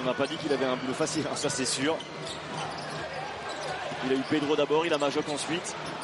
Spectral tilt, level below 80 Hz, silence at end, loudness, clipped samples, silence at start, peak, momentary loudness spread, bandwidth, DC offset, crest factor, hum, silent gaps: -3.5 dB/octave; -64 dBFS; 0 s; -30 LUFS; under 0.1%; 0 s; -12 dBFS; 10 LU; 11.5 kHz; under 0.1%; 18 dB; none; none